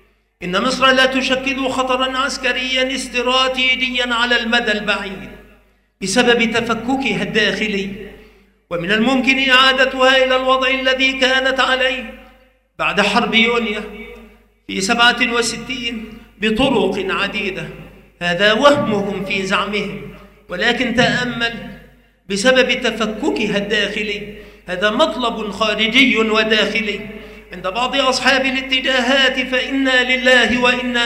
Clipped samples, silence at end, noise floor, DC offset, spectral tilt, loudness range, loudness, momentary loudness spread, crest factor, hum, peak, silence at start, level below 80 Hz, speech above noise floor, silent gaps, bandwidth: under 0.1%; 0 s; -52 dBFS; under 0.1%; -3 dB/octave; 4 LU; -15 LUFS; 15 LU; 18 dB; none; 0 dBFS; 0.4 s; -44 dBFS; 36 dB; none; 15.5 kHz